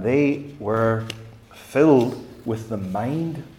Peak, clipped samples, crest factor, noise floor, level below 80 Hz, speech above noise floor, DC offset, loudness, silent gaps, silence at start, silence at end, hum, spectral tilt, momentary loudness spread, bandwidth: -4 dBFS; under 0.1%; 18 dB; -43 dBFS; -56 dBFS; 22 dB; under 0.1%; -22 LUFS; none; 0 s; 0.05 s; none; -7.5 dB/octave; 14 LU; 16 kHz